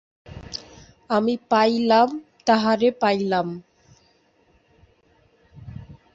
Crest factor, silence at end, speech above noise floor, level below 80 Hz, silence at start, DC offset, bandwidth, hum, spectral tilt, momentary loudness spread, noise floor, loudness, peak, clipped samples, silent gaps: 20 dB; 0.2 s; 41 dB; -56 dBFS; 0.3 s; under 0.1%; 7.8 kHz; none; -5.5 dB/octave; 22 LU; -61 dBFS; -21 LUFS; -4 dBFS; under 0.1%; none